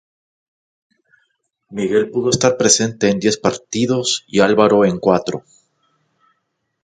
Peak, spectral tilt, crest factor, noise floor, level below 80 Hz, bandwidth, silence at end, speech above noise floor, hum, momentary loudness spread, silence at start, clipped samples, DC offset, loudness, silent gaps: 0 dBFS; -4 dB/octave; 18 dB; -72 dBFS; -54 dBFS; 9.6 kHz; 1.45 s; 56 dB; none; 9 LU; 1.7 s; under 0.1%; under 0.1%; -16 LUFS; none